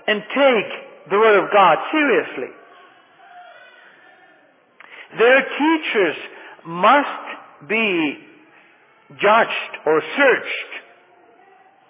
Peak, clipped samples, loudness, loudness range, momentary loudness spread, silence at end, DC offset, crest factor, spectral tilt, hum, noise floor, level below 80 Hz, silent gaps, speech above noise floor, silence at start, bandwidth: -2 dBFS; under 0.1%; -17 LUFS; 5 LU; 20 LU; 1.1 s; under 0.1%; 18 dB; -8 dB/octave; none; -54 dBFS; -84 dBFS; none; 37 dB; 0.05 s; 3.9 kHz